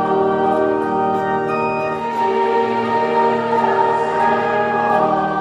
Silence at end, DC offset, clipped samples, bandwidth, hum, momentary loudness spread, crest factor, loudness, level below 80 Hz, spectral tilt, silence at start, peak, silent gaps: 0 s; under 0.1%; under 0.1%; 10 kHz; none; 3 LU; 14 dB; -17 LUFS; -56 dBFS; -6.5 dB/octave; 0 s; -4 dBFS; none